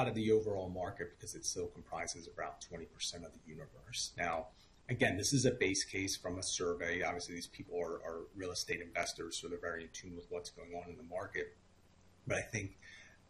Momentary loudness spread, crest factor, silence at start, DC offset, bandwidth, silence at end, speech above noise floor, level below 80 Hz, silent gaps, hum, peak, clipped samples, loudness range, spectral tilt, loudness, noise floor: 16 LU; 22 dB; 0 s; under 0.1%; 12.5 kHz; 0.15 s; 26 dB; -64 dBFS; none; none; -20 dBFS; under 0.1%; 8 LU; -3.5 dB/octave; -39 LUFS; -66 dBFS